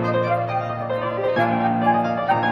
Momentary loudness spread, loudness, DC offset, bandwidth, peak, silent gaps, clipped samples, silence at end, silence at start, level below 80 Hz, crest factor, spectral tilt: 5 LU; -21 LUFS; under 0.1%; 6.8 kHz; -6 dBFS; none; under 0.1%; 0 s; 0 s; -58 dBFS; 14 dB; -8 dB/octave